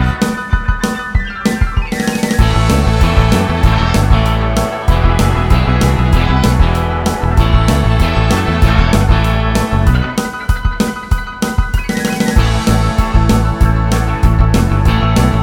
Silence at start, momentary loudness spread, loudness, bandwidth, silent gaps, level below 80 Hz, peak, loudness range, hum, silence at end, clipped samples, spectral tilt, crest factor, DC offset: 0 s; 6 LU; -13 LUFS; 17 kHz; none; -14 dBFS; 0 dBFS; 3 LU; none; 0 s; 0.5%; -6 dB/octave; 12 dB; under 0.1%